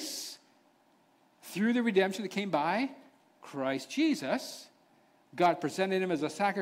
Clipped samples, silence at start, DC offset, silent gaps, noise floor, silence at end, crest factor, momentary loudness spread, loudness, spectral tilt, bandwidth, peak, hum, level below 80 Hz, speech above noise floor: under 0.1%; 0 s; under 0.1%; none; -67 dBFS; 0 s; 18 dB; 15 LU; -31 LUFS; -4.5 dB/octave; 16 kHz; -14 dBFS; none; -80 dBFS; 37 dB